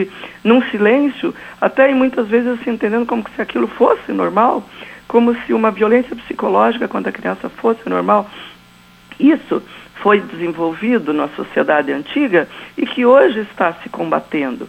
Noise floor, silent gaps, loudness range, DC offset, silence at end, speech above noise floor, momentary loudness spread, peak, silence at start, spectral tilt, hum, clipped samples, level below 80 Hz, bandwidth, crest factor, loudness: -45 dBFS; none; 2 LU; under 0.1%; 0 s; 29 dB; 11 LU; 0 dBFS; 0 s; -7 dB/octave; none; under 0.1%; -56 dBFS; 8.6 kHz; 16 dB; -16 LUFS